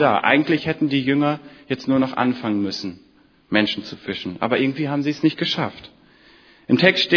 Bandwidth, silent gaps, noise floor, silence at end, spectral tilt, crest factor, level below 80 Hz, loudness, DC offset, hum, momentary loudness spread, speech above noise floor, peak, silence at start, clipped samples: 5.4 kHz; none; -51 dBFS; 0 s; -6 dB/octave; 20 dB; -60 dBFS; -21 LUFS; under 0.1%; none; 12 LU; 31 dB; 0 dBFS; 0 s; under 0.1%